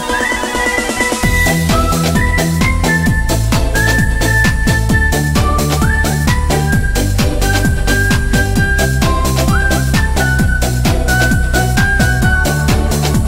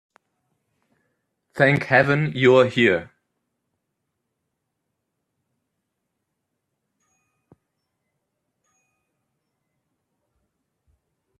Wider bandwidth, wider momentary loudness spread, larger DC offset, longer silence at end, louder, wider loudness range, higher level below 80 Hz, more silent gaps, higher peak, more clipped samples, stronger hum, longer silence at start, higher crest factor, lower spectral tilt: first, 16.5 kHz vs 9.6 kHz; second, 2 LU vs 7 LU; neither; second, 0 s vs 8.35 s; first, -13 LUFS vs -18 LUFS; second, 1 LU vs 6 LU; first, -16 dBFS vs -66 dBFS; neither; about the same, 0 dBFS vs -2 dBFS; neither; neither; second, 0 s vs 1.55 s; second, 12 dB vs 24 dB; second, -4.5 dB/octave vs -7 dB/octave